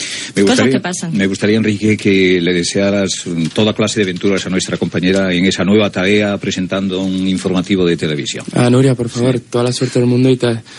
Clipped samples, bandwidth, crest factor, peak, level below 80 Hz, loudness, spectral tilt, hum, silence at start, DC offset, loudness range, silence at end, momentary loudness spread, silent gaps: under 0.1%; 11.5 kHz; 14 dB; 0 dBFS; -52 dBFS; -14 LUFS; -5 dB/octave; none; 0 s; under 0.1%; 1 LU; 0 s; 6 LU; none